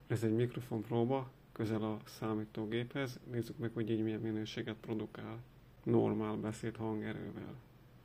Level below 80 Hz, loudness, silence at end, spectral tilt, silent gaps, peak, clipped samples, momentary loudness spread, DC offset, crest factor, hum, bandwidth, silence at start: -66 dBFS; -39 LUFS; 0 s; -7.5 dB/octave; none; -18 dBFS; under 0.1%; 12 LU; under 0.1%; 20 dB; none; 16 kHz; 0 s